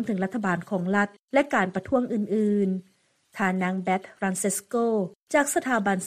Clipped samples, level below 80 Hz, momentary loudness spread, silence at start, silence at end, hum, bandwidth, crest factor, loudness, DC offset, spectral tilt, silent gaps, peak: under 0.1%; -64 dBFS; 5 LU; 0 s; 0 s; none; 15 kHz; 16 dB; -26 LUFS; under 0.1%; -5 dB/octave; 1.19-1.28 s, 5.22-5.27 s; -8 dBFS